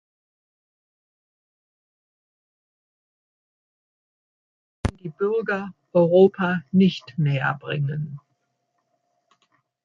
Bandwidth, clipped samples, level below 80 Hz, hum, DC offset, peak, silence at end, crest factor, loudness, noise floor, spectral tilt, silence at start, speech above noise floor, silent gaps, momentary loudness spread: 7.2 kHz; under 0.1%; -48 dBFS; none; under 0.1%; -4 dBFS; 1.65 s; 22 dB; -22 LUFS; -74 dBFS; -8 dB/octave; 4.85 s; 53 dB; none; 14 LU